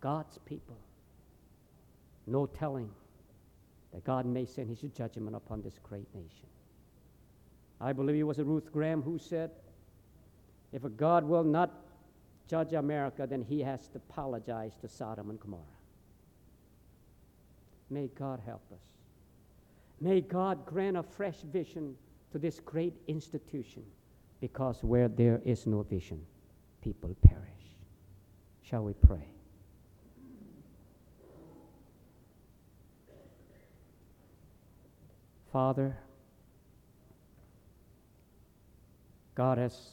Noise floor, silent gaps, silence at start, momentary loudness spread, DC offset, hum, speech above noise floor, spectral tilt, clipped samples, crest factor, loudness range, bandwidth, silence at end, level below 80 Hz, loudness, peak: -63 dBFS; none; 0 s; 21 LU; under 0.1%; none; 30 dB; -9 dB/octave; under 0.1%; 34 dB; 15 LU; 9.2 kHz; 0.05 s; -42 dBFS; -34 LUFS; -2 dBFS